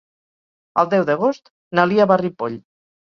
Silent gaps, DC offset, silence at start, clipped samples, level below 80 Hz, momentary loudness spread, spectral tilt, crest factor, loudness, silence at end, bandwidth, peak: 1.50-1.71 s; under 0.1%; 0.75 s; under 0.1%; -64 dBFS; 12 LU; -7.5 dB/octave; 18 dB; -19 LUFS; 0.55 s; 6.8 kHz; -2 dBFS